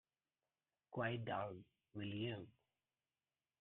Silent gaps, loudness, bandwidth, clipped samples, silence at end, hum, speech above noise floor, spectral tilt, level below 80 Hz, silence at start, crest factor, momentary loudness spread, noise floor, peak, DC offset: none; -47 LUFS; 4 kHz; under 0.1%; 1.1 s; none; over 44 dB; -4.5 dB/octave; -82 dBFS; 0.9 s; 20 dB; 14 LU; under -90 dBFS; -30 dBFS; under 0.1%